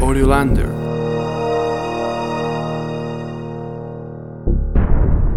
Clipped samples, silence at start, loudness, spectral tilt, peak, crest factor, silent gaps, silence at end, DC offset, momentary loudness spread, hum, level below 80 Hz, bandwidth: under 0.1%; 0 s; -20 LUFS; -7 dB/octave; 0 dBFS; 16 dB; none; 0 s; 0.4%; 13 LU; none; -20 dBFS; 13 kHz